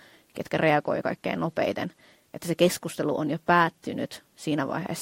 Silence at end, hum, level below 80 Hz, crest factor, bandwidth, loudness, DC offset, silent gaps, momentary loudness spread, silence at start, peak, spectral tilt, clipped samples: 0 s; none; -66 dBFS; 22 dB; 16.5 kHz; -27 LUFS; under 0.1%; none; 14 LU; 0.35 s; -6 dBFS; -5 dB/octave; under 0.1%